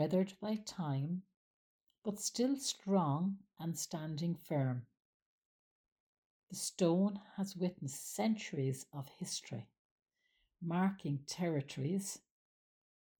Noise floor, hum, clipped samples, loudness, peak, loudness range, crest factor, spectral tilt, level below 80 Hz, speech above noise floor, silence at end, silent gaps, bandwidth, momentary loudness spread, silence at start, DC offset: -80 dBFS; none; under 0.1%; -38 LUFS; -20 dBFS; 4 LU; 18 dB; -5.5 dB/octave; -80 dBFS; 43 dB; 1 s; 1.36-1.87 s, 1.98-2.02 s, 5.05-5.84 s, 5.92-6.47 s, 9.79-9.98 s; 19 kHz; 11 LU; 0 s; under 0.1%